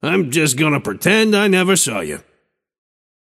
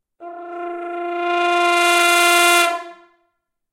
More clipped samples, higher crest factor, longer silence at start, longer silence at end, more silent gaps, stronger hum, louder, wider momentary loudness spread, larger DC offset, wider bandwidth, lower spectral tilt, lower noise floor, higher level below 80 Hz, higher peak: neither; about the same, 16 dB vs 18 dB; second, 0.05 s vs 0.2 s; first, 1.05 s vs 0.8 s; neither; neither; about the same, -15 LUFS vs -15 LUFS; second, 11 LU vs 19 LU; neither; about the same, 16 kHz vs 16.5 kHz; first, -4 dB/octave vs 1 dB/octave; second, -64 dBFS vs -71 dBFS; first, -56 dBFS vs -66 dBFS; about the same, 0 dBFS vs 0 dBFS